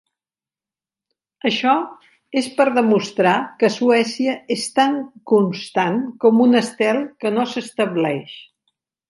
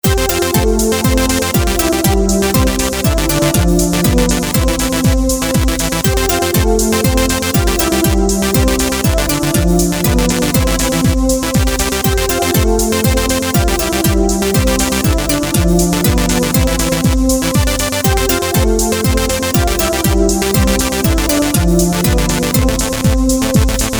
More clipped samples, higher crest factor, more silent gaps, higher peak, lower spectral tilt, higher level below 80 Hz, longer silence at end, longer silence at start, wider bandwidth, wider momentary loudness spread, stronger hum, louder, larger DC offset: neither; first, 18 dB vs 12 dB; neither; about the same, -2 dBFS vs 0 dBFS; about the same, -5 dB/octave vs -4.5 dB/octave; second, -72 dBFS vs -18 dBFS; first, 0.65 s vs 0 s; first, 1.45 s vs 0.05 s; second, 11.5 kHz vs over 20 kHz; first, 9 LU vs 2 LU; neither; second, -19 LUFS vs -13 LUFS; neither